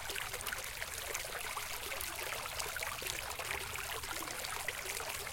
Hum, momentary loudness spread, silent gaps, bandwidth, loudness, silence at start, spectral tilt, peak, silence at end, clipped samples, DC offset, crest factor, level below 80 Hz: none; 1 LU; none; 17 kHz; -39 LUFS; 0 s; -0.5 dB/octave; -16 dBFS; 0 s; under 0.1%; under 0.1%; 26 dB; -58 dBFS